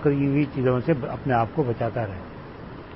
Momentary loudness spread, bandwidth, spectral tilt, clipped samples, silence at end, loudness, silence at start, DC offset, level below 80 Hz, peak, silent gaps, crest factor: 17 LU; 5.8 kHz; -12.5 dB/octave; under 0.1%; 0 s; -24 LUFS; 0 s; 0.1%; -48 dBFS; -8 dBFS; none; 16 dB